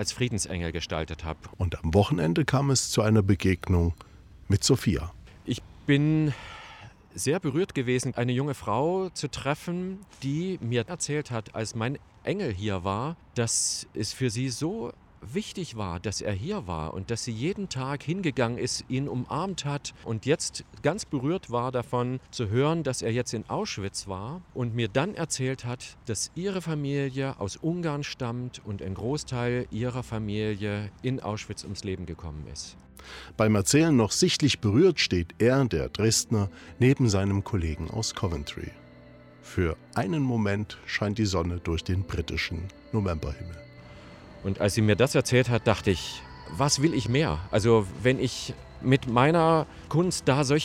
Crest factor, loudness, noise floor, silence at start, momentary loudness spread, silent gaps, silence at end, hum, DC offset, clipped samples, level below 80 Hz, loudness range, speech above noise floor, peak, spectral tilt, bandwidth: 20 dB; -27 LUFS; -50 dBFS; 0 s; 13 LU; none; 0 s; none; under 0.1%; under 0.1%; -48 dBFS; 7 LU; 23 dB; -8 dBFS; -5 dB/octave; 16 kHz